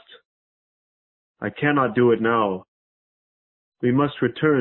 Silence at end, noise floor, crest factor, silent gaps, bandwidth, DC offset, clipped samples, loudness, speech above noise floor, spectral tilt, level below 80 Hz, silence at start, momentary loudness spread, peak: 0 s; under -90 dBFS; 18 dB; 2.68-3.72 s; 4.2 kHz; under 0.1%; under 0.1%; -21 LUFS; over 70 dB; -11.5 dB/octave; -60 dBFS; 1.4 s; 12 LU; -6 dBFS